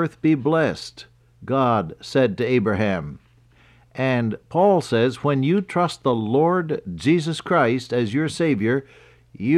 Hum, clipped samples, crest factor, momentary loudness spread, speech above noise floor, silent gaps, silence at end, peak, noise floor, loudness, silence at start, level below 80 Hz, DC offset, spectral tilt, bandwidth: none; under 0.1%; 14 dB; 7 LU; 33 dB; none; 0 s; -6 dBFS; -54 dBFS; -21 LUFS; 0 s; -56 dBFS; under 0.1%; -7 dB/octave; 12 kHz